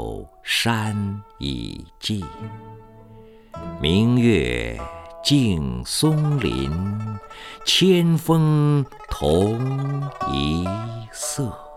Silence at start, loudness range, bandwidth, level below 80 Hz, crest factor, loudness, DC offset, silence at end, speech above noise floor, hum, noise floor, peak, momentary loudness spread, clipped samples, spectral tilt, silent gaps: 0 s; 7 LU; 15.5 kHz; -40 dBFS; 18 dB; -21 LUFS; under 0.1%; 0 s; 24 dB; none; -45 dBFS; -4 dBFS; 17 LU; under 0.1%; -5.5 dB/octave; none